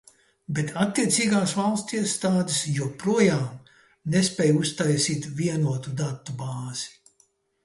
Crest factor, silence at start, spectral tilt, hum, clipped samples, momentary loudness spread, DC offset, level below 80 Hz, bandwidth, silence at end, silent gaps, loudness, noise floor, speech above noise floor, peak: 18 dB; 0.5 s; -4.5 dB/octave; none; under 0.1%; 11 LU; under 0.1%; -62 dBFS; 12 kHz; 0.75 s; none; -25 LUFS; -65 dBFS; 41 dB; -8 dBFS